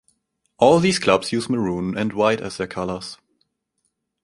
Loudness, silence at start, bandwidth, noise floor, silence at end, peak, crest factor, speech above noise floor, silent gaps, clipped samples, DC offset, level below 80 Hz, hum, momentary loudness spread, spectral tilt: -20 LUFS; 0.6 s; 11.5 kHz; -74 dBFS; 1.1 s; -2 dBFS; 20 dB; 54 dB; none; under 0.1%; under 0.1%; -52 dBFS; none; 12 LU; -5 dB/octave